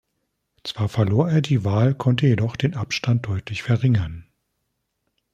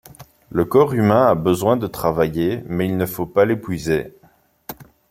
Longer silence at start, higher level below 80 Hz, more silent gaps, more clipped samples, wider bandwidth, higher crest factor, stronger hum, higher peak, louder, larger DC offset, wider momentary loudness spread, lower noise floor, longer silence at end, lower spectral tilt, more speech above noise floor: first, 0.65 s vs 0.2 s; about the same, -50 dBFS vs -48 dBFS; neither; neither; second, 8.6 kHz vs 16.5 kHz; about the same, 18 dB vs 18 dB; neither; about the same, -4 dBFS vs -2 dBFS; about the same, -21 LUFS vs -19 LUFS; neither; second, 9 LU vs 21 LU; first, -75 dBFS vs -56 dBFS; first, 1.1 s vs 0.25 s; about the same, -7 dB/octave vs -7 dB/octave; first, 55 dB vs 38 dB